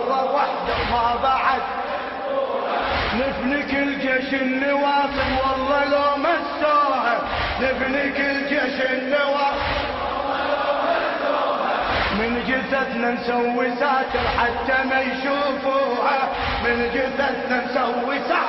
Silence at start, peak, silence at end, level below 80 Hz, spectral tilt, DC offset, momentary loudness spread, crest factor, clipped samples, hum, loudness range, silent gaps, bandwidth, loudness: 0 s; -6 dBFS; 0 s; -42 dBFS; -6.5 dB/octave; under 0.1%; 4 LU; 14 dB; under 0.1%; none; 2 LU; none; 6 kHz; -21 LUFS